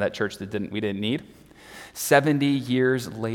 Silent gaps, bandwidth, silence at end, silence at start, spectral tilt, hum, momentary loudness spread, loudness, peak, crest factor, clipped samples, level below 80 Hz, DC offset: none; 18 kHz; 0 s; 0 s; -5 dB/octave; none; 14 LU; -24 LUFS; -4 dBFS; 22 dB; under 0.1%; -62 dBFS; under 0.1%